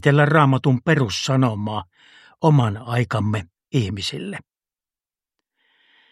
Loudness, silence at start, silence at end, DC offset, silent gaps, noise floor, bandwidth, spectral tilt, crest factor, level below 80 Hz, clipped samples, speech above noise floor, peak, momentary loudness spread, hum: -20 LUFS; 0.05 s; 1.7 s; under 0.1%; none; under -90 dBFS; 11.5 kHz; -6.5 dB/octave; 20 dB; -56 dBFS; under 0.1%; over 71 dB; 0 dBFS; 13 LU; none